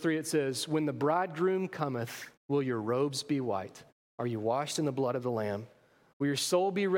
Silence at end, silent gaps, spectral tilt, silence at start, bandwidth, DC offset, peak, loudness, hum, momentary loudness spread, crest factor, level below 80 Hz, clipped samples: 0 s; 2.37-2.49 s, 3.92-4.18 s, 6.13-6.20 s; -5 dB/octave; 0 s; 16.5 kHz; under 0.1%; -16 dBFS; -32 LUFS; none; 9 LU; 16 dB; -78 dBFS; under 0.1%